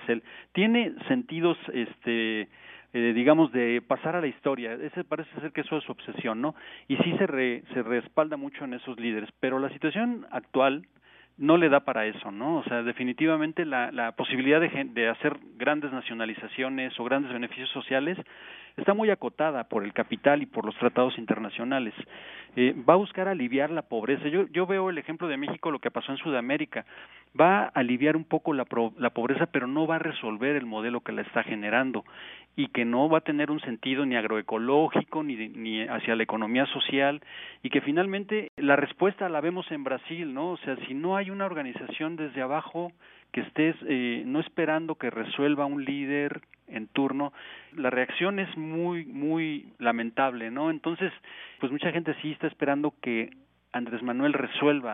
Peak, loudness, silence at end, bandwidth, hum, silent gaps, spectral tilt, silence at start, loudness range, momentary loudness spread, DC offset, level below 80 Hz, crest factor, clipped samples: -4 dBFS; -28 LUFS; 0 s; 3.9 kHz; none; 38.49-38.57 s; -3.5 dB/octave; 0 s; 4 LU; 11 LU; under 0.1%; -76 dBFS; 24 dB; under 0.1%